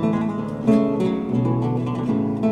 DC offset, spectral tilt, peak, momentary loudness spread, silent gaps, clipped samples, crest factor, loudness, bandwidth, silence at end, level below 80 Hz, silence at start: under 0.1%; -9.5 dB/octave; -4 dBFS; 5 LU; none; under 0.1%; 16 dB; -21 LUFS; 9 kHz; 0 s; -50 dBFS; 0 s